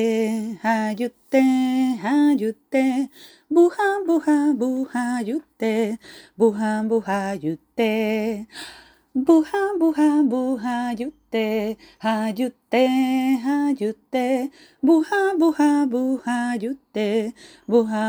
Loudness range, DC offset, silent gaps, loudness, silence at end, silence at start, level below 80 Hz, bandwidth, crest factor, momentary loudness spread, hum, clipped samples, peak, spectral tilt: 3 LU; under 0.1%; none; -22 LUFS; 0 s; 0 s; -66 dBFS; over 20 kHz; 16 dB; 10 LU; none; under 0.1%; -4 dBFS; -5.5 dB/octave